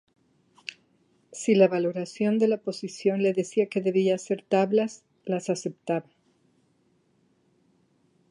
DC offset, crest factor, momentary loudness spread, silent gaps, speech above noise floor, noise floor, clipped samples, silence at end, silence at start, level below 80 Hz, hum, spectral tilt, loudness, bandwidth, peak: under 0.1%; 20 dB; 17 LU; none; 42 dB; -67 dBFS; under 0.1%; 2.3 s; 1.3 s; -80 dBFS; none; -6 dB/octave; -26 LUFS; 11 kHz; -6 dBFS